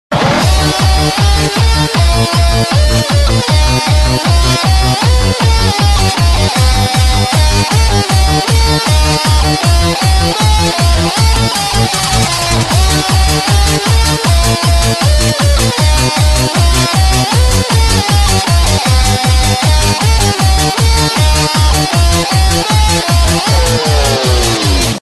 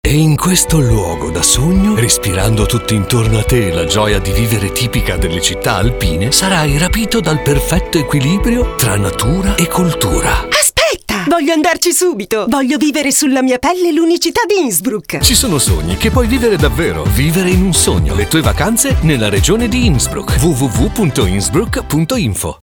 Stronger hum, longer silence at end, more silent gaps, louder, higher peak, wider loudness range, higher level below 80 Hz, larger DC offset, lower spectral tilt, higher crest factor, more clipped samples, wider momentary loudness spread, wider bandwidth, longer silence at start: neither; second, 0 s vs 0.2 s; neither; about the same, -10 LUFS vs -12 LUFS; about the same, 0 dBFS vs 0 dBFS; about the same, 0 LU vs 2 LU; first, -14 dBFS vs -22 dBFS; first, 0.3% vs under 0.1%; about the same, -4 dB/octave vs -4 dB/octave; about the same, 10 dB vs 12 dB; neither; second, 1 LU vs 4 LU; second, 12.5 kHz vs over 20 kHz; about the same, 0.1 s vs 0.05 s